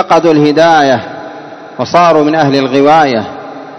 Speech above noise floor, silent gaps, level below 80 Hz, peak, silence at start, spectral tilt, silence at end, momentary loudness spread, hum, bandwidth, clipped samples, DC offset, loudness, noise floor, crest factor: 20 dB; none; -52 dBFS; 0 dBFS; 0 s; -6 dB/octave; 0 s; 19 LU; none; 8.4 kHz; 2%; under 0.1%; -8 LUFS; -28 dBFS; 10 dB